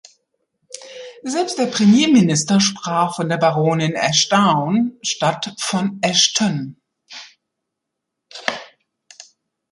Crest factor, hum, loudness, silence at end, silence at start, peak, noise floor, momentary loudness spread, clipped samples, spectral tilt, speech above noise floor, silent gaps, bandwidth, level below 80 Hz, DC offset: 18 dB; none; -17 LUFS; 1.05 s; 0.75 s; -2 dBFS; -80 dBFS; 22 LU; under 0.1%; -4 dB/octave; 63 dB; none; 11.5 kHz; -62 dBFS; under 0.1%